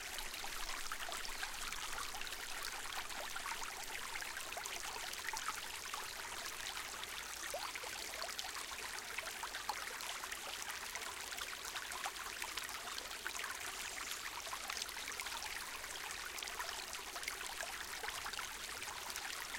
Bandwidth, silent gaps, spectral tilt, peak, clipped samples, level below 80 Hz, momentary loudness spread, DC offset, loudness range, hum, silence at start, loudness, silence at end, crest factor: 17 kHz; none; 0.5 dB/octave; -20 dBFS; under 0.1%; -62 dBFS; 2 LU; under 0.1%; 0 LU; none; 0 s; -43 LUFS; 0 s; 26 dB